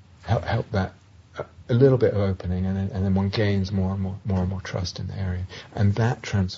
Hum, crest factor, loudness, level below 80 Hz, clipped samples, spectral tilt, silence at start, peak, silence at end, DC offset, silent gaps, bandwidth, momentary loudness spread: none; 20 dB; -25 LUFS; -46 dBFS; under 0.1%; -7.5 dB/octave; 0.2 s; -4 dBFS; 0 s; under 0.1%; none; 7.4 kHz; 13 LU